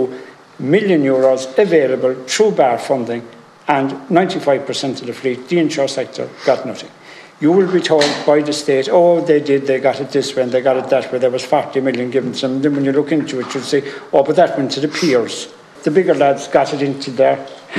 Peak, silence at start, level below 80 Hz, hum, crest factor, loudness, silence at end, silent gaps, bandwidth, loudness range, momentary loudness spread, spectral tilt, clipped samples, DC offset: 0 dBFS; 0 s; -68 dBFS; none; 16 dB; -16 LUFS; 0 s; none; 12.5 kHz; 4 LU; 9 LU; -5 dB/octave; under 0.1%; under 0.1%